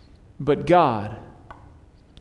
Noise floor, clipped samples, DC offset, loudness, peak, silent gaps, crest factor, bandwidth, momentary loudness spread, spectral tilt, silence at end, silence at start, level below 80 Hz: -50 dBFS; under 0.1%; under 0.1%; -21 LUFS; -4 dBFS; none; 20 dB; 11 kHz; 18 LU; -7.5 dB/octave; 0.9 s; 0.4 s; -50 dBFS